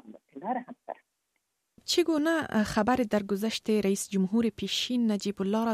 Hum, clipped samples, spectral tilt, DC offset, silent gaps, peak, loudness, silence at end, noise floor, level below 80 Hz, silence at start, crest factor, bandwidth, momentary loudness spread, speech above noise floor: none; under 0.1%; -4.5 dB/octave; under 0.1%; none; -12 dBFS; -28 LUFS; 0 s; -79 dBFS; -60 dBFS; 0.05 s; 18 dB; 15 kHz; 17 LU; 52 dB